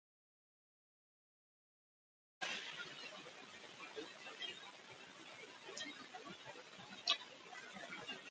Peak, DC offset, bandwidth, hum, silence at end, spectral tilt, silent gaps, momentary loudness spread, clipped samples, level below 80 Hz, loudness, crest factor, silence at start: -22 dBFS; under 0.1%; 9 kHz; none; 0 s; -1 dB/octave; none; 15 LU; under 0.1%; under -90 dBFS; -48 LUFS; 30 dB; 2.4 s